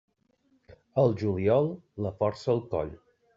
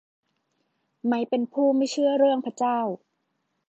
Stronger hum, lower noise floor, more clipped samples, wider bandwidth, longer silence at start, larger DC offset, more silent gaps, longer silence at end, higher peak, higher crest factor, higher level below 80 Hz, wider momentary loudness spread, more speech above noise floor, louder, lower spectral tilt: neither; second, -69 dBFS vs -76 dBFS; neither; about the same, 7.6 kHz vs 8.2 kHz; about the same, 0.95 s vs 1.05 s; neither; neither; second, 0.4 s vs 0.75 s; about the same, -10 dBFS vs -10 dBFS; about the same, 18 dB vs 16 dB; first, -60 dBFS vs -84 dBFS; about the same, 10 LU vs 10 LU; second, 42 dB vs 53 dB; second, -28 LUFS vs -24 LUFS; first, -8 dB/octave vs -5 dB/octave